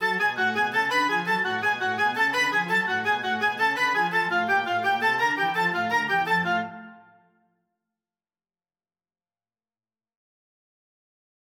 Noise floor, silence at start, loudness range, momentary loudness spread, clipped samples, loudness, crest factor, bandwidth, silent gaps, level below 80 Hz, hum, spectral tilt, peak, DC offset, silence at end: under -90 dBFS; 0 s; 6 LU; 2 LU; under 0.1%; -23 LUFS; 16 dB; 19 kHz; none; -78 dBFS; none; -3.5 dB/octave; -12 dBFS; under 0.1%; 4.55 s